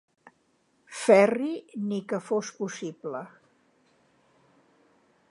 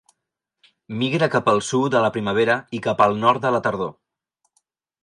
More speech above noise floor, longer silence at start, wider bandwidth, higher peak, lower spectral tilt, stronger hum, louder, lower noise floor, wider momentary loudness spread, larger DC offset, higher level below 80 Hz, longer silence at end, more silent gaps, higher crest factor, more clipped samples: second, 43 dB vs 61 dB; about the same, 0.9 s vs 0.9 s; about the same, 11.5 kHz vs 11.5 kHz; about the same, -4 dBFS vs -2 dBFS; about the same, -5 dB/octave vs -5 dB/octave; neither; second, -27 LUFS vs -20 LUFS; second, -69 dBFS vs -81 dBFS; first, 18 LU vs 8 LU; neither; second, -84 dBFS vs -60 dBFS; first, 2.05 s vs 1.1 s; neither; about the same, 24 dB vs 20 dB; neither